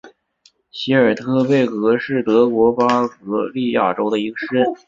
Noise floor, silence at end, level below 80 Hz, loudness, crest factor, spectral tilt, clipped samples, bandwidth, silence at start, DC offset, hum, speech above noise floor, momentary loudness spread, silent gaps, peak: -57 dBFS; 0.1 s; -58 dBFS; -17 LUFS; 16 dB; -7 dB/octave; under 0.1%; 7.6 kHz; 0.05 s; under 0.1%; none; 40 dB; 7 LU; none; -2 dBFS